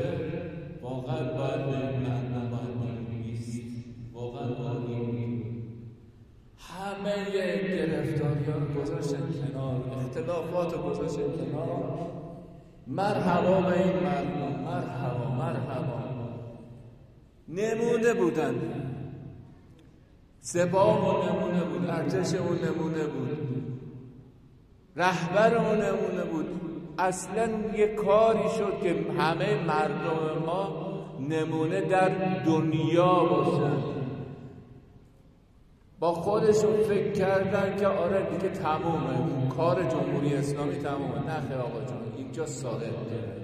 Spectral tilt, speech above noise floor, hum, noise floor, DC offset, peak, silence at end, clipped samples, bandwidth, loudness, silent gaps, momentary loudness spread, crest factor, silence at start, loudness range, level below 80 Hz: -7 dB/octave; 30 dB; none; -57 dBFS; under 0.1%; -10 dBFS; 0 s; under 0.1%; 14 kHz; -29 LUFS; none; 14 LU; 20 dB; 0 s; 7 LU; -58 dBFS